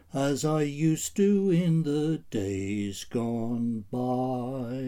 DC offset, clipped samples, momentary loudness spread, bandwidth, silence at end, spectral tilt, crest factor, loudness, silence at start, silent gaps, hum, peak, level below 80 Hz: under 0.1%; under 0.1%; 8 LU; 17.5 kHz; 0 s; -6.5 dB/octave; 14 dB; -28 LUFS; 0.15 s; none; none; -14 dBFS; -60 dBFS